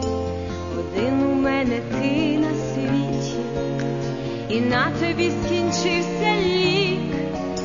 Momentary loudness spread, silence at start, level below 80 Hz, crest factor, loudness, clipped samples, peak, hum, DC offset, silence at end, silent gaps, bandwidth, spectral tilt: 7 LU; 0 s; -44 dBFS; 16 dB; -22 LUFS; under 0.1%; -6 dBFS; none; 0.4%; 0 s; none; 7.4 kHz; -5.5 dB/octave